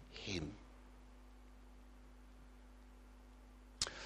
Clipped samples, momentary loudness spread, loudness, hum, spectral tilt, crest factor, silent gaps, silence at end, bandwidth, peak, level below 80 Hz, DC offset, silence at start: under 0.1%; 18 LU; -45 LUFS; none; -3 dB/octave; 32 dB; none; 0 s; 15 kHz; -20 dBFS; -60 dBFS; under 0.1%; 0 s